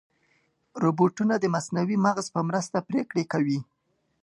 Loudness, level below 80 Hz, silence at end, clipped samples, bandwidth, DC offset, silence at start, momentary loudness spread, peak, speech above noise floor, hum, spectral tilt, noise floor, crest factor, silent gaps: -26 LUFS; -72 dBFS; 0.6 s; under 0.1%; 11.5 kHz; under 0.1%; 0.75 s; 5 LU; -8 dBFS; 44 dB; none; -6.5 dB/octave; -69 dBFS; 18 dB; none